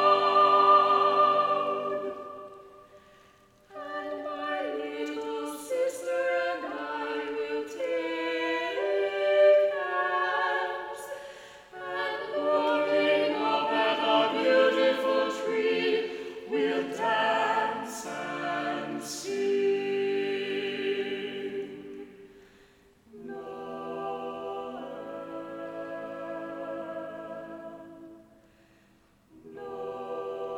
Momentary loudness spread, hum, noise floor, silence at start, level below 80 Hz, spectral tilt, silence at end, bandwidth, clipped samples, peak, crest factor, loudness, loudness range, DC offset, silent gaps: 18 LU; none; -62 dBFS; 0 s; -72 dBFS; -3.5 dB/octave; 0 s; 16.5 kHz; under 0.1%; -10 dBFS; 18 dB; -28 LUFS; 14 LU; under 0.1%; none